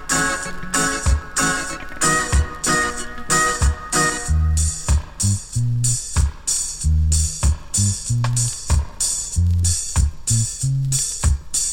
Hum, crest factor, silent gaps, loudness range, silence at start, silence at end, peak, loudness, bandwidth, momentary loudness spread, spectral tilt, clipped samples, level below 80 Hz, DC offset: none; 16 dB; none; 1 LU; 0 s; 0 s; -4 dBFS; -20 LUFS; 17 kHz; 4 LU; -3 dB/octave; under 0.1%; -24 dBFS; under 0.1%